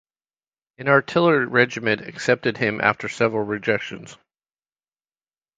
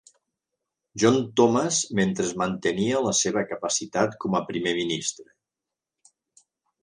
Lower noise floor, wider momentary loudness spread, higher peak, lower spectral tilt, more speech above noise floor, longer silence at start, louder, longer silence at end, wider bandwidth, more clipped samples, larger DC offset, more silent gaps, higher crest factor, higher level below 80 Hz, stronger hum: about the same, under -90 dBFS vs -88 dBFS; about the same, 7 LU vs 7 LU; first, 0 dBFS vs -6 dBFS; first, -5.5 dB/octave vs -4 dB/octave; first, over 69 dB vs 64 dB; second, 0.8 s vs 0.95 s; first, -21 LUFS vs -24 LUFS; second, 1.4 s vs 1.6 s; second, 9.2 kHz vs 11 kHz; neither; neither; neither; about the same, 22 dB vs 20 dB; about the same, -62 dBFS vs -62 dBFS; neither